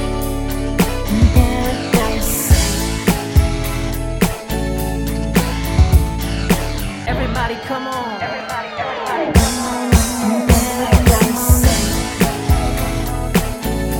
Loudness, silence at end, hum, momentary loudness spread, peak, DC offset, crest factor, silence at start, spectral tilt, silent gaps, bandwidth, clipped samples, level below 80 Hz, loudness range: -17 LUFS; 0 s; none; 9 LU; 0 dBFS; under 0.1%; 16 dB; 0 s; -5 dB/octave; none; over 20 kHz; under 0.1%; -20 dBFS; 4 LU